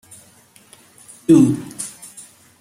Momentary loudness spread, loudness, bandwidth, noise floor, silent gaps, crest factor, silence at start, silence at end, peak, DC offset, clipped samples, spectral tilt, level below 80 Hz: 24 LU; -17 LUFS; 15.5 kHz; -50 dBFS; none; 18 dB; 1.3 s; 0.7 s; -2 dBFS; under 0.1%; under 0.1%; -6.5 dB/octave; -60 dBFS